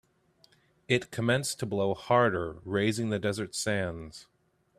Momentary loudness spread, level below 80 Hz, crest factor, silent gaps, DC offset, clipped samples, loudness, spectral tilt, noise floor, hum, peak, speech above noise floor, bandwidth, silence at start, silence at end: 10 LU; -62 dBFS; 20 dB; none; under 0.1%; under 0.1%; -29 LUFS; -5 dB/octave; -65 dBFS; none; -10 dBFS; 36 dB; 15 kHz; 0.9 s; 0.55 s